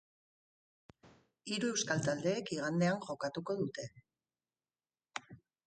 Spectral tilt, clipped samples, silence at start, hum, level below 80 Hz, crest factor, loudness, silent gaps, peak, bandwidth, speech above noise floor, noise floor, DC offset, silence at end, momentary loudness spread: -4.5 dB/octave; under 0.1%; 1.05 s; none; -76 dBFS; 22 dB; -37 LUFS; none; -18 dBFS; 9 kHz; over 54 dB; under -90 dBFS; under 0.1%; 0.3 s; 14 LU